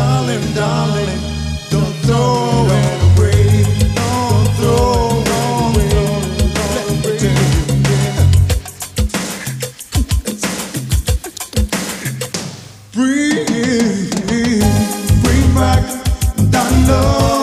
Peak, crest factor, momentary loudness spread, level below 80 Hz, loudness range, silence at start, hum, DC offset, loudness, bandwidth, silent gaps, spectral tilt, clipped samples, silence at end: 0 dBFS; 12 dB; 9 LU; -22 dBFS; 6 LU; 0 s; none; under 0.1%; -15 LUFS; 15.5 kHz; none; -5.5 dB/octave; under 0.1%; 0 s